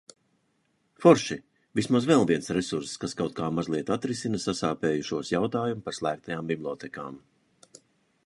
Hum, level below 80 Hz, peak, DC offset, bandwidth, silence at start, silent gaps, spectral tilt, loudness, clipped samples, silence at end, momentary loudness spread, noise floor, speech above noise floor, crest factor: none; -62 dBFS; -4 dBFS; under 0.1%; 11.5 kHz; 1 s; none; -5.5 dB/octave; -27 LUFS; under 0.1%; 1.1 s; 12 LU; -72 dBFS; 45 dB; 24 dB